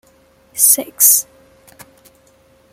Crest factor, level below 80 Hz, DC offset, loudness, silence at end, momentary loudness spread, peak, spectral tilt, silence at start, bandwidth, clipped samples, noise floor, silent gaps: 18 dB; -62 dBFS; under 0.1%; -10 LUFS; 1.5 s; 20 LU; 0 dBFS; 0.5 dB/octave; 0.55 s; over 20 kHz; under 0.1%; -52 dBFS; none